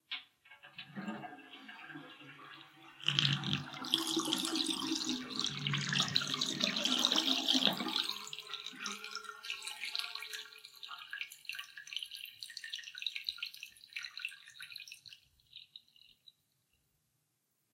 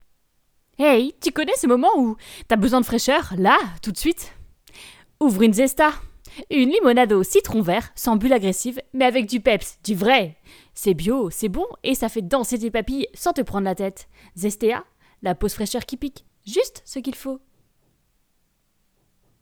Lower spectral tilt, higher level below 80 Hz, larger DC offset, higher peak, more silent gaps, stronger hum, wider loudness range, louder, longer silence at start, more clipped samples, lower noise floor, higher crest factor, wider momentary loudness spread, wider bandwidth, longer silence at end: second, -2.5 dB/octave vs -4.5 dB/octave; second, -82 dBFS vs -44 dBFS; neither; second, -8 dBFS vs -2 dBFS; neither; neither; first, 15 LU vs 9 LU; second, -35 LUFS vs -21 LUFS; second, 0.1 s vs 0.8 s; neither; first, -81 dBFS vs -67 dBFS; first, 30 dB vs 20 dB; first, 21 LU vs 13 LU; second, 16.5 kHz vs over 20 kHz; about the same, 1.95 s vs 2.05 s